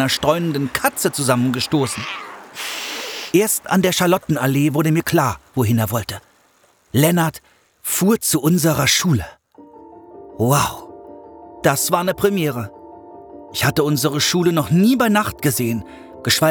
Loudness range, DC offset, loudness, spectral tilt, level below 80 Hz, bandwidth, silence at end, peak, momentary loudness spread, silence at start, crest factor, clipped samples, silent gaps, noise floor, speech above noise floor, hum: 3 LU; under 0.1%; -18 LUFS; -4.5 dB/octave; -50 dBFS; over 20 kHz; 0 s; -2 dBFS; 13 LU; 0 s; 16 dB; under 0.1%; none; -56 dBFS; 39 dB; none